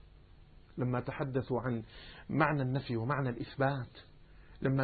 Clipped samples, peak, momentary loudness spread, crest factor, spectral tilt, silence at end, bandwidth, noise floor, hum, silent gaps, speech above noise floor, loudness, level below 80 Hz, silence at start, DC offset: under 0.1%; -14 dBFS; 13 LU; 22 dB; -6.5 dB/octave; 0 s; 4.6 kHz; -57 dBFS; none; none; 23 dB; -35 LUFS; -58 dBFS; 0 s; under 0.1%